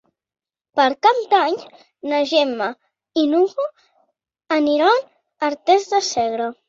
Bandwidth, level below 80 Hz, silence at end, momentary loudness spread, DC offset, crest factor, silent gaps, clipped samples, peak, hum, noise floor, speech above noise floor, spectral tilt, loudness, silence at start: 7.8 kHz; -66 dBFS; 0.15 s; 10 LU; under 0.1%; 18 dB; none; under 0.1%; -2 dBFS; none; under -90 dBFS; over 72 dB; -2.5 dB/octave; -19 LUFS; 0.75 s